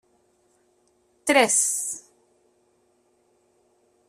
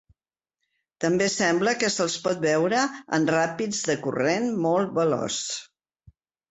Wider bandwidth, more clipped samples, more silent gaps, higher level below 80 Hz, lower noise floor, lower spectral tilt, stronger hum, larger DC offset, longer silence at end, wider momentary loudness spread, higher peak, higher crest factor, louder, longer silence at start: first, 15.5 kHz vs 8.4 kHz; neither; neither; second, -74 dBFS vs -66 dBFS; second, -66 dBFS vs -89 dBFS; second, -0.5 dB/octave vs -4 dB/octave; neither; neither; first, 2.1 s vs 0.85 s; first, 13 LU vs 5 LU; first, -4 dBFS vs -8 dBFS; first, 24 dB vs 18 dB; first, -21 LUFS vs -24 LUFS; first, 1.25 s vs 1 s